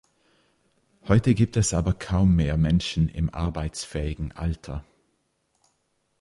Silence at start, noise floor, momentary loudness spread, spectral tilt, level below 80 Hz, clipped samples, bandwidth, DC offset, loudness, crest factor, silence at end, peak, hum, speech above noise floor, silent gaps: 1.05 s; -72 dBFS; 11 LU; -6 dB/octave; -36 dBFS; under 0.1%; 11.5 kHz; under 0.1%; -24 LUFS; 18 dB; 1.4 s; -6 dBFS; none; 49 dB; none